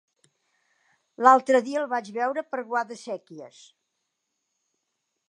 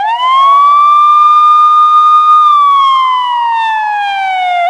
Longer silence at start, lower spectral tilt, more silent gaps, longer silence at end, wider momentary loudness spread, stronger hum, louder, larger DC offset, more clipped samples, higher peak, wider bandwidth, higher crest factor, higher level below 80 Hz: first, 1.2 s vs 0 s; first, -4 dB/octave vs 0.5 dB/octave; neither; first, 1.8 s vs 0 s; first, 18 LU vs 8 LU; neither; second, -23 LUFS vs -6 LUFS; neither; neither; second, -4 dBFS vs 0 dBFS; about the same, 10 kHz vs 9.6 kHz; first, 24 dB vs 8 dB; second, -88 dBFS vs -60 dBFS